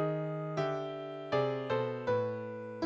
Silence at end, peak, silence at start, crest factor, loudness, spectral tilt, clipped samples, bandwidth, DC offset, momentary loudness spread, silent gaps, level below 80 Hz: 0 s; -18 dBFS; 0 s; 18 dB; -35 LUFS; -7.5 dB/octave; under 0.1%; 7.8 kHz; under 0.1%; 8 LU; none; -72 dBFS